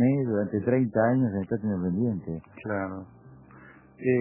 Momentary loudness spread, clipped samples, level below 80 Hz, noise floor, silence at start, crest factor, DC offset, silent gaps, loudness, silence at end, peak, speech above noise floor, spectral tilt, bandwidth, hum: 13 LU; under 0.1%; -54 dBFS; -51 dBFS; 0 s; 16 dB; under 0.1%; none; -27 LUFS; 0 s; -10 dBFS; 24 dB; -13.5 dB/octave; 3.1 kHz; none